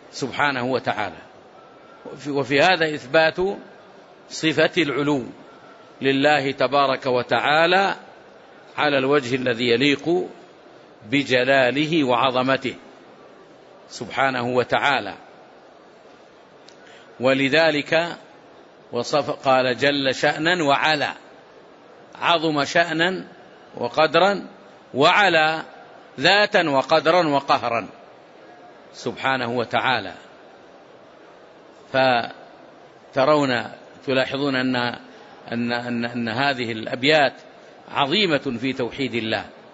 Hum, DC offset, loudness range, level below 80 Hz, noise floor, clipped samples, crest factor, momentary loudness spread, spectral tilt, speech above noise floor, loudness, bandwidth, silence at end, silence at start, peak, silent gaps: none; under 0.1%; 6 LU; -64 dBFS; -48 dBFS; under 0.1%; 18 dB; 14 LU; -4.5 dB/octave; 28 dB; -20 LUFS; 8 kHz; 0.2 s; 0.15 s; -4 dBFS; none